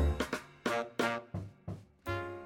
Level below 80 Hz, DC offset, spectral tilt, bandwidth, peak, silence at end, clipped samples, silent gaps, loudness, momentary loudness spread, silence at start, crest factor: -42 dBFS; under 0.1%; -5.5 dB/octave; 17 kHz; -16 dBFS; 0 s; under 0.1%; none; -37 LUFS; 13 LU; 0 s; 20 dB